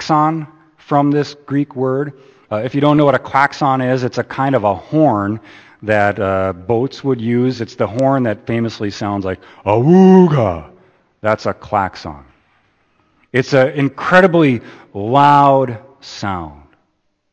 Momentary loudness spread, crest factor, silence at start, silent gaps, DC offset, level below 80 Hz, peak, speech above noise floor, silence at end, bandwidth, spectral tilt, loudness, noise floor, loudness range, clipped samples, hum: 15 LU; 16 dB; 0 s; none; under 0.1%; -50 dBFS; 0 dBFS; 51 dB; 0.8 s; 8.4 kHz; -7.5 dB/octave; -15 LUFS; -65 dBFS; 4 LU; under 0.1%; none